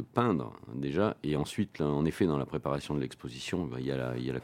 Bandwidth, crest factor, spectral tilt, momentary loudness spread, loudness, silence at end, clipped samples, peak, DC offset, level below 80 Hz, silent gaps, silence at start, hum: 16 kHz; 22 dB; -7 dB/octave; 7 LU; -33 LUFS; 0 s; under 0.1%; -10 dBFS; under 0.1%; -56 dBFS; none; 0 s; none